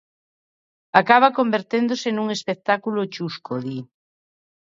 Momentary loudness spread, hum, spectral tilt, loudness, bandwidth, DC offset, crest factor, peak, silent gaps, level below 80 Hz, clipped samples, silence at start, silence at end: 14 LU; none; -5 dB/octave; -21 LUFS; 7.8 kHz; under 0.1%; 22 dB; 0 dBFS; none; -70 dBFS; under 0.1%; 0.95 s; 0.95 s